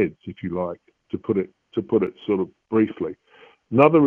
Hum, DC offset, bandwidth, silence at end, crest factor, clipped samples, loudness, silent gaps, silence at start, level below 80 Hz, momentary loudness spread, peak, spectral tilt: none; under 0.1%; 4 kHz; 0 s; 20 dB; under 0.1%; -24 LUFS; none; 0 s; -60 dBFS; 12 LU; -2 dBFS; -10 dB/octave